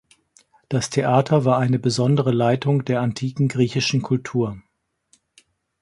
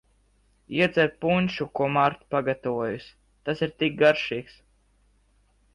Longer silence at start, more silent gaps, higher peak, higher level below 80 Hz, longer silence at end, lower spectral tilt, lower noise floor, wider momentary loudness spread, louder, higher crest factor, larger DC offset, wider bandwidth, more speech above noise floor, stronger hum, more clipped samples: about the same, 0.7 s vs 0.7 s; neither; first, -4 dBFS vs -8 dBFS; about the same, -56 dBFS vs -58 dBFS; about the same, 1.2 s vs 1.3 s; about the same, -6.5 dB/octave vs -7 dB/octave; about the same, -64 dBFS vs -64 dBFS; second, 7 LU vs 11 LU; first, -20 LUFS vs -25 LUFS; about the same, 18 dB vs 18 dB; neither; about the same, 11.5 kHz vs 11 kHz; first, 44 dB vs 39 dB; second, none vs 50 Hz at -60 dBFS; neither